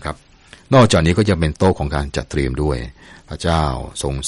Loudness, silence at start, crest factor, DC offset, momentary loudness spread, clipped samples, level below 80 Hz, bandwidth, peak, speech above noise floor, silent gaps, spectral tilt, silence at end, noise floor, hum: -17 LUFS; 0 s; 16 dB; under 0.1%; 15 LU; under 0.1%; -30 dBFS; 11.5 kHz; -2 dBFS; 29 dB; none; -6 dB/octave; 0 s; -46 dBFS; none